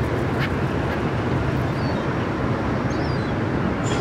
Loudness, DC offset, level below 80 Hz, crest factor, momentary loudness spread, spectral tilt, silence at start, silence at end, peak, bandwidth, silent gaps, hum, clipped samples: -23 LUFS; under 0.1%; -36 dBFS; 12 dB; 1 LU; -7 dB/octave; 0 s; 0 s; -10 dBFS; 14 kHz; none; none; under 0.1%